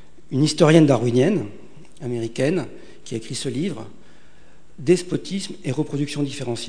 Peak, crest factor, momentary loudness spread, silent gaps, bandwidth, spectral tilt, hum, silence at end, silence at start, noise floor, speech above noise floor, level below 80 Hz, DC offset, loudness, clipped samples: 0 dBFS; 22 dB; 19 LU; none; 10 kHz; -6 dB/octave; none; 0 s; 0.3 s; -53 dBFS; 32 dB; -58 dBFS; 1%; -21 LUFS; under 0.1%